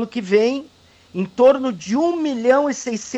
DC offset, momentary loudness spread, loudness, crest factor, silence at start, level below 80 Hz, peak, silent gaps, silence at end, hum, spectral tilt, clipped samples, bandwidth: under 0.1%; 12 LU; -18 LUFS; 14 dB; 0 s; -62 dBFS; -4 dBFS; none; 0 s; none; -5 dB/octave; under 0.1%; 8.2 kHz